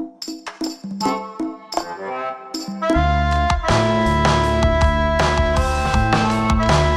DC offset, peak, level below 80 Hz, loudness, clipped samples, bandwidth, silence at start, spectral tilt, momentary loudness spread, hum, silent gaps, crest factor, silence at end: under 0.1%; -2 dBFS; -24 dBFS; -19 LUFS; under 0.1%; 13.5 kHz; 0 s; -5.5 dB/octave; 12 LU; none; none; 16 dB; 0 s